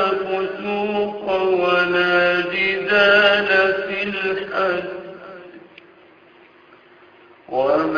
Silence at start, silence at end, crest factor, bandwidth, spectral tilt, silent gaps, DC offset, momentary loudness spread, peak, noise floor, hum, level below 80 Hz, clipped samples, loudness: 0 s; 0 s; 18 dB; 5.2 kHz; -5.5 dB/octave; none; under 0.1%; 15 LU; -2 dBFS; -49 dBFS; none; -58 dBFS; under 0.1%; -18 LUFS